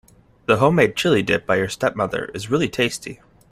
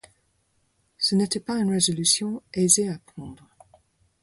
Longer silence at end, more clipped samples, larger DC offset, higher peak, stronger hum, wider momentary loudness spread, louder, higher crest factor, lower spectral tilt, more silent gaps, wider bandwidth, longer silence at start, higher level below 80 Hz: second, 0.35 s vs 0.9 s; neither; neither; about the same, -2 dBFS vs -4 dBFS; neither; second, 11 LU vs 20 LU; about the same, -20 LUFS vs -22 LUFS; second, 18 dB vs 24 dB; first, -5 dB/octave vs -3.5 dB/octave; neither; first, 16 kHz vs 12 kHz; second, 0.5 s vs 1 s; first, -52 dBFS vs -62 dBFS